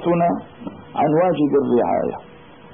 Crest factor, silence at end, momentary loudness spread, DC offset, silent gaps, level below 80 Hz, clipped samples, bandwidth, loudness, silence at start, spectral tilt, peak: 12 dB; 0.05 s; 18 LU; 0.2%; none; -56 dBFS; under 0.1%; 3.6 kHz; -19 LUFS; 0 s; -12.5 dB/octave; -8 dBFS